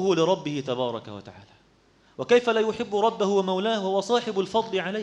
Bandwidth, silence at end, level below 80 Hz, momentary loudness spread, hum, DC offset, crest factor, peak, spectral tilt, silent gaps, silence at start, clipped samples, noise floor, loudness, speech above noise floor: 9.8 kHz; 0 s; -66 dBFS; 9 LU; none; under 0.1%; 16 dB; -8 dBFS; -5 dB/octave; none; 0 s; under 0.1%; -60 dBFS; -24 LUFS; 35 dB